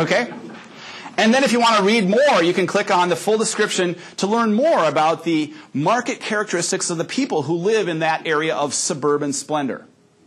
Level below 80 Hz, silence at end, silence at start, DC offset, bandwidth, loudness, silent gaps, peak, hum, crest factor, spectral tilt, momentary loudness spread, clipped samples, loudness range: -74 dBFS; 0.45 s; 0 s; under 0.1%; 13 kHz; -19 LUFS; none; -4 dBFS; none; 16 dB; -3.5 dB/octave; 10 LU; under 0.1%; 4 LU